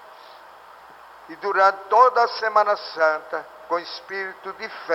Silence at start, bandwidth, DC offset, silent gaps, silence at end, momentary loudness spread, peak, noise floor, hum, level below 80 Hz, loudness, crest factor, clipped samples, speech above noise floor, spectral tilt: 0.3 s; 15.5 kHz; under 0.1%; none; 0 s; 16 LU; -4 dBFS; -46 dBFS; none; -74 dBFS; -21 LUFS; 18 dB; under 0.1%; 24 dB; -3 dB/octave